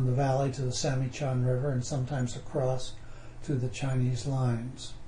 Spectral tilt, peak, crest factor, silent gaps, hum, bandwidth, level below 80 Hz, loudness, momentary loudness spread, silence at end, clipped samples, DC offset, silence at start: -6 dB/octave; -16 dBFS; 14 dB; none; none; 10.5 kHz; -48 dBFS; -31 LUFS; 10 LU; 0 s; under 0.1%; under 0.1%; 0 s